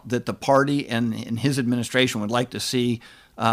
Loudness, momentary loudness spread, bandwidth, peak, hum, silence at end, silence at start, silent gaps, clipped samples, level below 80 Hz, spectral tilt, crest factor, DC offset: -23 LUFS; 7 LU; 15.5 kHz; -6 dBFS; none; 0 s; 0.05 s; none; under 0.1%; -60 dBFS; -5 dB/octave; 18 dB; under 0.1%